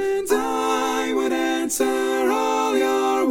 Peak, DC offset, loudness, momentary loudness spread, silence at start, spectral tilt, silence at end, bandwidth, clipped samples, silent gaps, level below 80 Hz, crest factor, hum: -6 dBFS; under 0.1%; -21 LUFS; 2 LU; 0 s; -2 dB/octave; 0 s; 17 kHz; under 0.1%; none; -56 dBFS; 14 dB; none